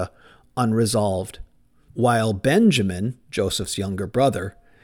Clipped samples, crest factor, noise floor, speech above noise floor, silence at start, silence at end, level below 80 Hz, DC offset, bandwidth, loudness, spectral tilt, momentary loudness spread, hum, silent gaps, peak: under 0.1%; 16 dB; -55 dBFS; 34 dB; 0 s; 0.35 s; -48 dBFS; 0.1%; 18 kHz; -22 LUFS; -5.5 dB/octave; 15 LU; none; none; -6 dBFS